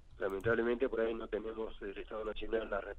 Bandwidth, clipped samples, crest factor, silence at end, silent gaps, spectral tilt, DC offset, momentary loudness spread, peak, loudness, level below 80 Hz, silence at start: 9.4 kHz; under 0.1%; 16 dB; 0 s; none; -7 dB/octave; under 0.1%; 10 LU; -20 dBFS; -37 LUFS; -52 dBFS; 0 s